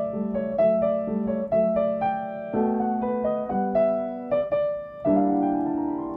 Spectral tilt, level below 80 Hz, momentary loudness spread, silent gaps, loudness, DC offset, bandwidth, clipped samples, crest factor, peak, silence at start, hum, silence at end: -11 dB/octave; -56 dBFS; 6 LU; none; -25 LUFS; under 0.1%; 4.3 kHz; under 0.1%; 14 dB; -10 dBFS; 0 s; none; 0 s